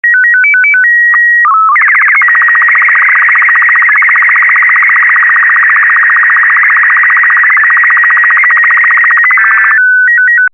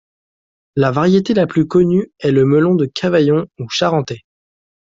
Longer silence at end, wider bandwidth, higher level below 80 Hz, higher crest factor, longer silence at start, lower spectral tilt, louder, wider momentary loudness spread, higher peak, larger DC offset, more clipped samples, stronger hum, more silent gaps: second, 0.05 s vs 0.75 s; first, 9.6 kHz vs 7.6 kHz; second, -88 dBFS vs -52 dBFS; second, 4 dB vs 14 dB; second, 0.05 s vs 0.75 s; second, 3.5 dB/octave vs -7 dB/octave; first, -4 LUFS vs -15 LUFS; second, 0 LU vs 8 LU; about the same, 0 dBFS vs -2 dBFS; neither; neither; neither; neither